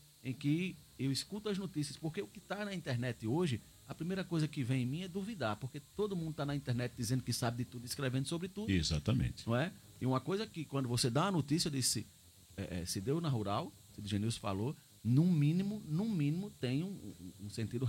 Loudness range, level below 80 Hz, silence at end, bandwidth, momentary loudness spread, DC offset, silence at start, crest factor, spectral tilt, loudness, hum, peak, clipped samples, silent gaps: 4 LU; -58 dBFS; 0 s; 16.5 kHz; 11 LU; under 0.1%; 0.25 s; 18 dB; -5.5 dB/octave; -37 LUFS; none; -18 dBFS; under 0.1%; none